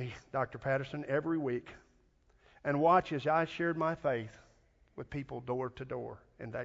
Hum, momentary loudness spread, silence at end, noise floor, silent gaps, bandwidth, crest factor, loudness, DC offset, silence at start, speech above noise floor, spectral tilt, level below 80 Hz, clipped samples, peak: none; 17 LU; 0 s; -68 dBFS; none; 7.6 kHz; 22 dB; -34 LUFS; under 0.1%; 0 s; 34 dB; -5.5 dB/octave; -64 dBFS; under 0.1%; -14 dBFS